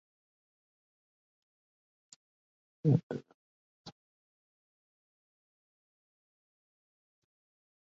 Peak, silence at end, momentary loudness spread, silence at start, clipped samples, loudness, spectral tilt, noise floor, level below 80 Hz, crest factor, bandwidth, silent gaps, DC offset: -14 dBFS; 3.95 s; 25 LU; 2.85 s; under 0.1%; -33 LUFS; -10 dB/octave; under -90 dBFS; -74 dBFS; 26 dB; 7.4 kHz; 3.03-3.10 s, 3.34-3.85 s; under 0.1%